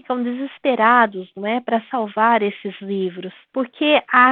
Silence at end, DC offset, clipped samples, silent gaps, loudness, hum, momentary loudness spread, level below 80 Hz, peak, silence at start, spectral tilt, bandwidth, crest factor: 0 s; under 0.1%; under 0.1%; none; -19 LUFS; none; 13 LU; -74 dBFS; -2 dBFS; 0.1 s; -8 dB/octave; 4.4 kHz; 16 dB